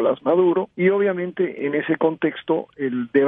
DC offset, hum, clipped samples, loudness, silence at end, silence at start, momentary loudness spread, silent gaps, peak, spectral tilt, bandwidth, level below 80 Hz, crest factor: under 0.1%; none; under 0.1%; -21 LUFS; 0 s; 0 s; 7 LU; none; -6 dBFS; -10.5 dB/octave; 3.9 kHz; -70 dBFS; 14 dB